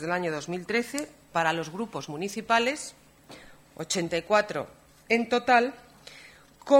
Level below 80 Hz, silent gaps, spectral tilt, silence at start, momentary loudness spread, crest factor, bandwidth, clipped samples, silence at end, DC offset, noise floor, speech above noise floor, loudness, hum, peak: -64 dBFS; none; -4 dB/octave; 0 s; 23 LU; 22 dB; 16 kHz; under 0.1%; 0 s; under 0.1%; -52 dBFS; 24 dB; -27 LUFS; none; -6 dBFS